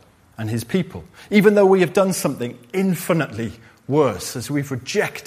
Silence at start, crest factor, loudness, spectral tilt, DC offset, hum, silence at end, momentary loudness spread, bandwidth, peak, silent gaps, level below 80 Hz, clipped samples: 0.4 s; 18 dB; -20 LUFS; -5.5 dB/octave; under 0.1%; none; 0.05 s; 16 LU; 15.5 kHz; -2 dBFS; none; -56 dBFS; under 0.1%